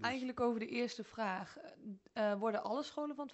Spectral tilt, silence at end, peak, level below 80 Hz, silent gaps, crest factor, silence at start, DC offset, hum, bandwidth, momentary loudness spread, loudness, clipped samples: -5 dB/octave; 0 s; -22 dBFS; -76 dBFS; none; 16 dB; 0 s; under 0.1%; none; 8.2 kHz; 15 LU; -39 LUFS; under 0.1%